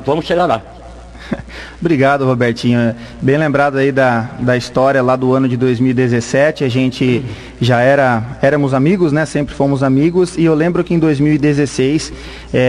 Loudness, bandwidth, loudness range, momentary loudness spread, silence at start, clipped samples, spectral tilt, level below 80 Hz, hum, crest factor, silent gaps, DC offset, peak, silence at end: -14 LUFS; 11.5 kHz; 2 LU; 7 LU; 0 s; under 0.1%; -7 dB/octave; -38 dBFS; none; 12 dB; none; under 0.1%; -2 dBFS; 0 s